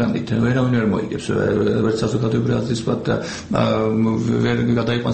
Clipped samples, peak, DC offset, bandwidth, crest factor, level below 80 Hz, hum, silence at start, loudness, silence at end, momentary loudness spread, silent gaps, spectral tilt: under 0.1%; -2 dBFS; 0.1%; 8.8 kHz; 16 dB; -44 dBFS; none; 0 s; -19 LUFS; 0 s; 4 LU; none; -7 dB/octave